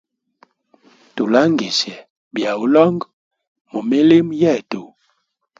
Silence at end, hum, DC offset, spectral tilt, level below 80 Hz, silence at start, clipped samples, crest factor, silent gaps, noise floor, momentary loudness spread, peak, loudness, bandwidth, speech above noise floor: 0.75 s; none; under 0.1%; -5.5 dB/octave; -62 dBFS; 1.15 s; under 0.1%; 18 dB; 2.10-2.31 s, 3.13-3.31 s, 3.47-3.55 s, 3.61-3.65 s; -68 dBFS; 17 LU; 0 dBFS; -16 LUFS; 7.6 kHz; 52 dB